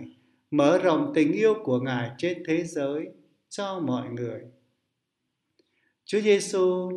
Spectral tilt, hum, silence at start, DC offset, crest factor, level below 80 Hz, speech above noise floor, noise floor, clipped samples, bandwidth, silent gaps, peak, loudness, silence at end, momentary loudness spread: -5.5 dB/octave; none; 0 s; under 0.1%; 18 dB; -76 dBFS; 56 dB; -80 dBFS; under 0.1%; 12 kHz; none; -8 dBFS; -25 LUFS; 0 s; 13 LU